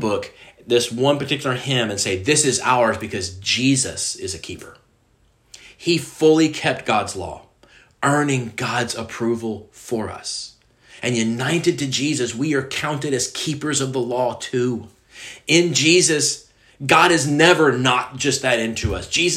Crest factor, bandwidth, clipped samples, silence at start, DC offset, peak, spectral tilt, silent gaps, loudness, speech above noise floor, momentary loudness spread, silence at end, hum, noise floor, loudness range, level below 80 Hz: 20 dB; 15.5 kHz; under 0.1%; 0 s; under 0.1%; 0 dBFS; -3.5 dB/octave; none; -19 LUFS; 39 dB; 14 LU; 0 s; none; -59 dBFS; 7 LU; -50 dBFS